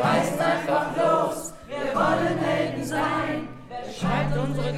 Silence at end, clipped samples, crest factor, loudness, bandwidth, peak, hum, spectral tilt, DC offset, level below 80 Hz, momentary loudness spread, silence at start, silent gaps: 0 s; under 0.1%; 16 dB; -25 LUFS; 16 kHz; -8 dBFS; none; -5.5 dB/octave; under 0.1%; -44 dBFS; 11 LU; 0 s; none